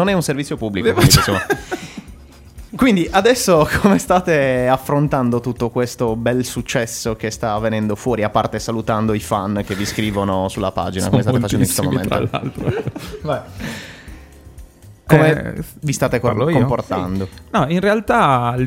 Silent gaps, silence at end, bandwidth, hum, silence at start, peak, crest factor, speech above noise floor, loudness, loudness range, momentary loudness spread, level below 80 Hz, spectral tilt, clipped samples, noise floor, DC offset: none; 0 s; 16 kHz; none; 0 s; 0 dBFS; 18 dB; 23 dB; -17 LUFS; 5 LU; 11 LU; -38 dBFS; -5 dB/octave; under 0.1%; -40 dBFS; under 0.1%